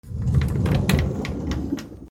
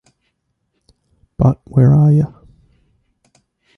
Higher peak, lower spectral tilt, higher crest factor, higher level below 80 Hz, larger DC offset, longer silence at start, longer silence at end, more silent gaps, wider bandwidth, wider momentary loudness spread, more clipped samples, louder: second, -6 dBFS vs -2 dBFS; second, -6.5 dB/octave vs -11.5 dB/octave; about the same, 16 dB vs 14 dB; first, -32 dBFS vs -40 dBFS; neither; second, 0.05 s vs 1.4 s; second, 0 s vs 1.5 s; neither; first, 17 kHz vs 2.1 kHz; about the same, 8 LU vs 6 LU; neither; second, -24 LUFS vs -14 LUFS